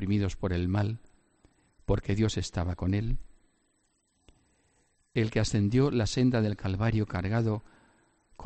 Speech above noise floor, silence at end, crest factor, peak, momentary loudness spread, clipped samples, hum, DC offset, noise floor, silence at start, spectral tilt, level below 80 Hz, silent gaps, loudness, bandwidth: 45 dB; 0 s; 18 dB; -12 dBFS; 9 LU; under 0.1%; none; under 0.1%; -73 dBFS; 0 s; -6.5 dB/octave; -44 dBFS; none; -29 LUFS; 8.8 kHz